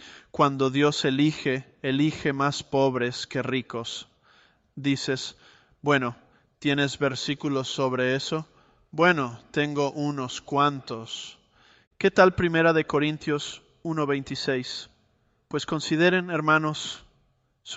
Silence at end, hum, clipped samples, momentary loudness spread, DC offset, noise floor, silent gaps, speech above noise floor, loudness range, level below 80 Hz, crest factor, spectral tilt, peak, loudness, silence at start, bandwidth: 0 s; none; under 0.1%; 13 LU; under 0.1%; -67 dBFS; 11.87-11.91 s; 42 dB; 5 LU; -60 dBFS; 22 dB; -5 dB/octave; -4 dBFS; -25 LUFS; 0 s; 8.2 kHz